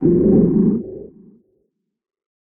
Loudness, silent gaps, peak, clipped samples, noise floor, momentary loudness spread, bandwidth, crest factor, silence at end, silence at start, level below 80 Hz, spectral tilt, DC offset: -15 LUFS; none; -2 dBFS; under 0.1%; -69 dBFS; 20 LU; 2.1 kHz; 16 dB; 1.35 s; 0 s; -40 dBFS; -17 dB/octave; under 0.1%